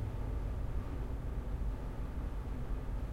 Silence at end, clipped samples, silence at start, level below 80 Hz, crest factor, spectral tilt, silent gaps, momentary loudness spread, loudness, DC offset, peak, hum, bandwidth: 0 s; under 0.1%; 0 s; -40 dBFS; 12 dB; -8 dB/octave; none; 2 LU; -42 LUFS; under 0.1%; -26 dBFS; none; 8.4 kHz